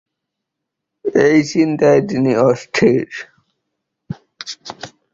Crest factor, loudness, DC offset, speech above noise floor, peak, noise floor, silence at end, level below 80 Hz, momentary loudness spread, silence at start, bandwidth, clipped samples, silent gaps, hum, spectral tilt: 16 dB; -15 LUFS; under 0.1%; 65 dB; -2 dBFS; -79 dBFS; 0.25 s; -54 dBFS; 20 LU; 1.05 s; 7.8 kHz; under 0.1%; none; none; -6 dB/octave